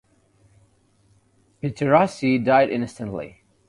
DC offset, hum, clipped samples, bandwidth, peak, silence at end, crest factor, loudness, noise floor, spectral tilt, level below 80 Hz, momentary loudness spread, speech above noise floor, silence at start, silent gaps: under 0.1%; none; under 0.1%; 11.5 kHz; -4 dBFS; 0.4 s; 20 dB; -21 LUFS; -61 dBFS; -7 dB/octave; -58 dBFS; 14 LU; 40 dB; 1.65 s; none